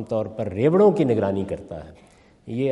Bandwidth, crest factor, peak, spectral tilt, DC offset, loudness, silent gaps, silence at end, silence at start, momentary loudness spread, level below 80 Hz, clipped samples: 10.5 kHz; 16 dB; -6 dBFS; -9 dB/octave; under 0.1%; -21 LUFS; none; 0 s; 0 s; 17 LU; -56 dBFS; under 0.1%